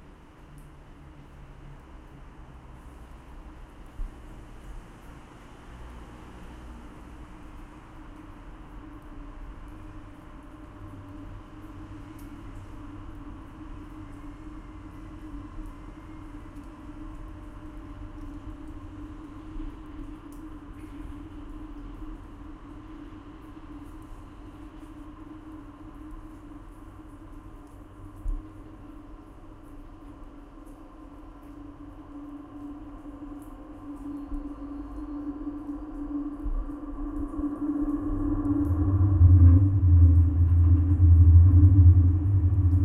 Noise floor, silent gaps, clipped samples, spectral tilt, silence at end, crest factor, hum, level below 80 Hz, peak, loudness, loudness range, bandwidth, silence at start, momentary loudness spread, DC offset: -49 dBFS; none; under 0.1%; -10.5 dB/octave; 0 s; 20 dB; none; -34 dBFS; -6 dBFS; -23 LUFS; 26 LU; 3.1 kHz; 1.65 s; 27 LU; under 0.1%